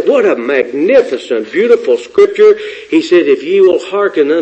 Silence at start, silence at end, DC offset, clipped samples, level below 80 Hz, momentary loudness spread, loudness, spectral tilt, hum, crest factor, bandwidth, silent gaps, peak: 0 s; 0 s; under 0.1%; 0.2%; -56 dBFS; 6 LU; -11 LUFS; -5 dB/octave; none; 10 dB; 8.4 kHz; none; 0 dBFS